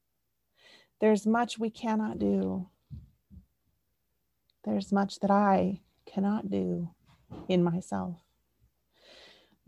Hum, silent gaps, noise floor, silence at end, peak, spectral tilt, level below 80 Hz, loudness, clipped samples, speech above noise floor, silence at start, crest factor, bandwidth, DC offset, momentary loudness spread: none; none; -81 dBFS; 1.5 s; -14 dBFS; -7 dB/octave; -62 dBFS; -30 LUFS; under 0.1%; 53 dB; 1 s; 18 dB; 11.5 kHz; under 0.1%; 20 LU